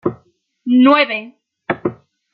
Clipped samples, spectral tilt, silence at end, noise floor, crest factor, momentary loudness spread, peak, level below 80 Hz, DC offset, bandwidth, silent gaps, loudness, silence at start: under 0.1%; -8 dB/octave; 0.4 s; -56 dBFS; 16 dB; 17 LU; -2 dBFS; -60 dBFS; under 0.1%; 5 kHz; none; -15 LUFS; 0.05 s